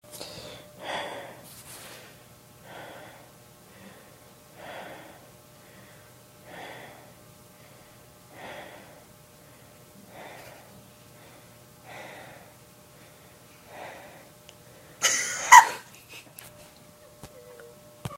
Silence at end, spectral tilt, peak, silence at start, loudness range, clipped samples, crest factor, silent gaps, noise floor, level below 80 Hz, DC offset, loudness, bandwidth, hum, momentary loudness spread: 0 s; -0.5 dB/octave; 0 dBFS; 0.15 s; 25 LU; under 0.1%; 30 dB; none; -53 dBFS; -68 dBFS; under 0.1%; -20 LUFS; 16 kHz; none; 25 LU